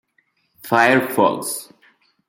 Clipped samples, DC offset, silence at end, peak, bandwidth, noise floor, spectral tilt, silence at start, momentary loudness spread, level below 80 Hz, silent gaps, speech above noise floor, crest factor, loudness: under 0.1%; under 0.1%; 0.65 s; -2 dBFS; 17 kHz; -65 dBFS; -4 dB/octave; 0.65 s; 14 LU; -68 dBFS; none; 48 dB; 18 dB; -18 LUFS